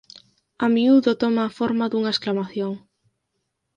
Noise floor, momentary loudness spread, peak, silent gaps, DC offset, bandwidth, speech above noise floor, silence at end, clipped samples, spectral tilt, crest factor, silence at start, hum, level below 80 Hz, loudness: -76 dBFS; 12 LU; -6 dBFS; none; under 0.1%; 8.6 kHz; 56 dB; 1 s; under 0.1%; -6.5 dB/octave; 16 dB; 0.6 s; none; -66 dBFS; -21 LUFS